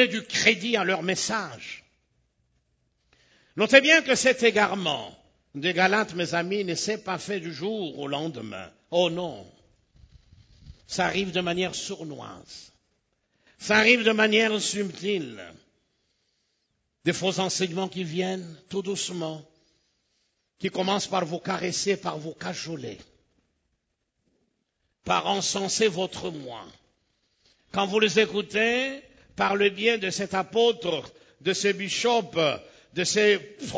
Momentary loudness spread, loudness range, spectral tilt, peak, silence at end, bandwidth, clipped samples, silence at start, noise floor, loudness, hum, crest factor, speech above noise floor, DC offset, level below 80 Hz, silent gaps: 18 LU; 9 LU; -3 dB/octave; -2 dBFS; 0 s; 8 kHz; under 0.1%; 0 s; -78 dBFS; -25 LUFS; none; 26 dB; 52 dB; under 0.1%; -64 dBFS; none